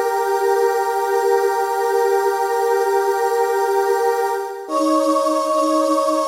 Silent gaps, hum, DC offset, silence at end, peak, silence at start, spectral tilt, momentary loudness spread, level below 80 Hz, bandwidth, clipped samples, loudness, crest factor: none; none; under 0.1%; 0 s; -6 dBFS; 0 s; -1.5 dB/octave; 2 LU; -72 dBFS; 16.5 kHz; under 0.1%; -18 LUFS; 12 dB